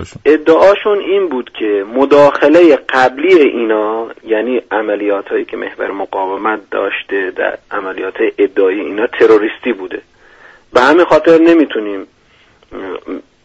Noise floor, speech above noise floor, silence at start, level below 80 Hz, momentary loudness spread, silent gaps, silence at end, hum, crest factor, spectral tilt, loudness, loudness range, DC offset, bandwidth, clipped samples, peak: -48 dBFS; 37 dB; 0 s; -50 dBFS; 14 LU; none; 0.25 s; none; 12 dB; -5.5 dB/octave; -12 LUFS; 7 LU; under 0.1%; 8 kHz; under 0.1%; 0 dBFS